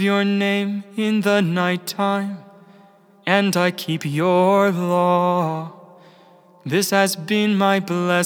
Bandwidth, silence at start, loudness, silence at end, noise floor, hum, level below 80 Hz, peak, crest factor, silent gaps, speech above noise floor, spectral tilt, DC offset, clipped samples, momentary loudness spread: over 20 kHz; 0 s; -19 LUFS; 0 s; -50 dBFS; none; -86 dBFS; -2 dBFS; 18 dB; none; 32 dB; -5 dB/octave; under 0.1%; under 0.1%; 8 LU